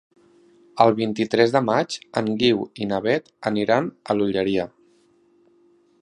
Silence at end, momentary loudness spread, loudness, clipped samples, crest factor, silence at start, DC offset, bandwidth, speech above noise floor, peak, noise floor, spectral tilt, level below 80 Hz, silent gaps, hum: 1.35 s; 8 LU; -22 LUFS; under 0.1%; 22 dB; 0.75 s; under 0.1%; 10.5 kHz; 38 dB; -2 dBFS; -59 dBFS; -6 dB/octave; -60 dBFS; none; none